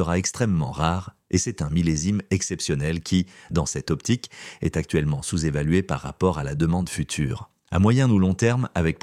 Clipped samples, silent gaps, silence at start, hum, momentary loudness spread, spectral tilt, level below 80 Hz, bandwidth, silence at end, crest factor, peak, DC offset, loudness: under 0.1%; none; 0 s; none; 7 LU; -5.5 dB/octave; -40 dBFS; 13.5 kHz; 0.05 s; 18 dB; -4 dBFS; under 0.1%; -24 LUFS